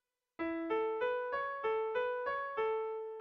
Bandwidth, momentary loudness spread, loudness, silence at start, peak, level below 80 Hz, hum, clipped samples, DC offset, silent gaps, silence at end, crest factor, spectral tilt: 5.4 kHz; 4 LU; -37 LUFS; 0.4 s; -26 dBFS; -74 dBFS; none; under 0.1%; under 0.1%; none; 0 s; 12 dB; -1.5 dB/octave